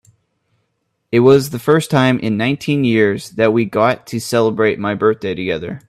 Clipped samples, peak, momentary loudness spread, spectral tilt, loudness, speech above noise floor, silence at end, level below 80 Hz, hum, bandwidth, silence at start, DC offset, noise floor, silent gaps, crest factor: under 0.1%; 0 dBFS; 7 LU; -6 dB/octave; -15 LUFS; 54 dB; 0.1 s; -52 dBFS; none; 14.5 kHz; 1.1 s; under 0.1%; -69 dBFS; none; 16 dB